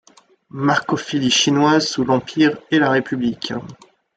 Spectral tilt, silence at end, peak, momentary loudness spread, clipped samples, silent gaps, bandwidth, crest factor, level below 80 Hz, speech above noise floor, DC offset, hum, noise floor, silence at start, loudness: -4 dB/octave; 0.4 s; -2 dBFS; 11 LU; under 0.1%; none; 9.2 kHz; 16 dB; -58 dBFS; 33 dB; under 0.1%; none; -51 dBFS; 0.55 s; -18 LUFS